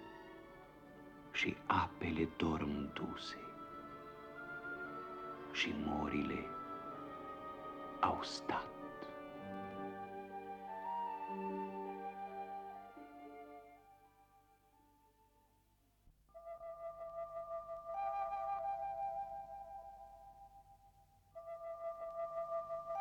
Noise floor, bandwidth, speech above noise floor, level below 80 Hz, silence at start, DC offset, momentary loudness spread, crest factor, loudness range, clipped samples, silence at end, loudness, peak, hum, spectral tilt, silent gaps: -74 dBFS; 19.5 kHz; 35 dB; -68 dBFS; 0 s; under 0.1%; 19 LU; 26 dB; 13 LU; under 0.1%; 0 s; -43 LUFS; -20 dBFS; none; -5.5 dB/octave; none